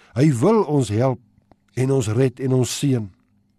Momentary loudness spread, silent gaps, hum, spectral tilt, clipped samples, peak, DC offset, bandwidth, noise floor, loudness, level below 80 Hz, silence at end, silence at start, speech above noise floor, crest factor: 10 LU; none; none; -6.5 dB/octave; under 0.1%; -6 dBFS; under 0.1%; 13 kHz; -57 dBFS; -20 LUFS; -58 dBFS; 0.5 s; 0.15 s; 38 dB; 14 dB